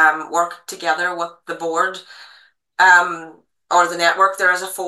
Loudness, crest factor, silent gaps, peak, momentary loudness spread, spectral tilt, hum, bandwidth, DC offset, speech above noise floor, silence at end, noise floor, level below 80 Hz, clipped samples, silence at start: -17 LUFS; 18 dB; none; 0 dBFS; 15 LU; -1.5 dB/octave; none; 12.5 kHz; under 0.1%; 33 dB; 0 s; -51 dBFS; -80 dBFS; under 0.1%; 0 s